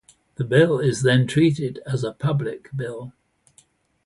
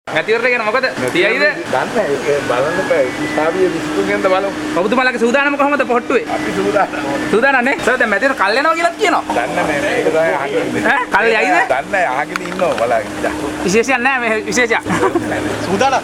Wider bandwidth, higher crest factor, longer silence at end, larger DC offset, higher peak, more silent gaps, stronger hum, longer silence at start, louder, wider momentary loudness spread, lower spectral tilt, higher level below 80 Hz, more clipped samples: second, 11.5 kHz vs 16.5 kHz; about the same, 18 dB vs 14 dB; first, 0.95 s vs 0 s; neither; second, -4 dBFS vs 0 dBFS; neither; neither; first, 0.4 s vs 0.05 s; second, -21 LUFS vs -15 LUFS; first, 14 LU vs 5 LU; first, -6.5 dB/octave vs -4 dB/octave; second, -58 dBFS vs -46 dBFS; neither